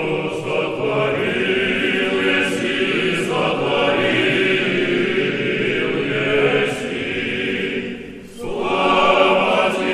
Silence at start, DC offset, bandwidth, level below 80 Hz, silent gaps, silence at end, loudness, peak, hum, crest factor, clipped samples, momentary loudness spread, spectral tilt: 0 s; under 0.1%; 12.5 kHz; -50 dBFS; none; 0 s; -18 LUFS; -2 dBFS; none; 16 dB; under 0.1%; 8 LU; -5 dB/octave